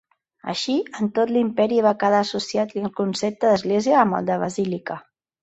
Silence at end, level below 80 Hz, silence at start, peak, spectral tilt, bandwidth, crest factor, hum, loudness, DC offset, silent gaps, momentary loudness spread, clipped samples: 0.45 s; -64 dBFS; 0.45 s; -4 dBFS; -5.5 dB/octave; 8.2 kHz; 18 dB; none; -21 LUFS; under 0.1%; none; 9 LU; under 0.1%